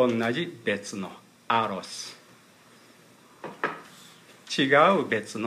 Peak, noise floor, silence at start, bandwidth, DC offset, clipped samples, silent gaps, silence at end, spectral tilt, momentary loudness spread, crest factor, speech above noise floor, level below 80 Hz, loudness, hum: -6 dBFS; -55 dBFS; 0 s; 15.5 kHz; under 0.1%; under 0.1%; none; 0 s; -4.5 dB/octave; 22 LU; 22 dB; 30 dB; -76 dBFS; -26 LUFS; none